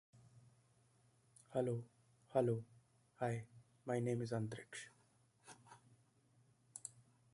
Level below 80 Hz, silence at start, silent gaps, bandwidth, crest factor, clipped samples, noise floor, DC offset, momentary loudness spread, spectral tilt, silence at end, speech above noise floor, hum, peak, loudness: -80 dBFS; 0.15 s; none; 11.5 kHz; 24 dB; under 0.1%; -74 dBFS; under 0.1%; 23 LU; -6.5 dB/octave; 0.45 s; 34 dB; none; -22 dBFS; -43 LUFS